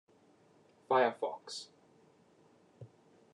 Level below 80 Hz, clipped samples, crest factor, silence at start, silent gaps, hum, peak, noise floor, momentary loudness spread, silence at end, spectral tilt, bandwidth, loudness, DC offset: -88 dBFS; under 0.1%; 22 dB; 0.9 s; none; none; -16 dBFS; -66 dBFS; 27 LU; 0.45 s; -4 dB/octave; 11 kHz; -34 LUFS; under 0.1%